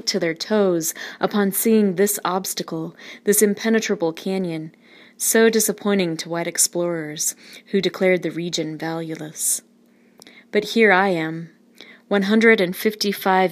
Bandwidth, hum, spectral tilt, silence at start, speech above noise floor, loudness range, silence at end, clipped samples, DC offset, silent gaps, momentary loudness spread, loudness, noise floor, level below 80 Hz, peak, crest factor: 15.5 kHz; none; -3.5 dB/octave; 0.05 s; 35 dB; 4 LU; 0 s; under 0.1%; under 0.1%; none; 12 LU; -20 LUFS; -55 dBFS; -74 dBFS; 0 dBFS; 20 dB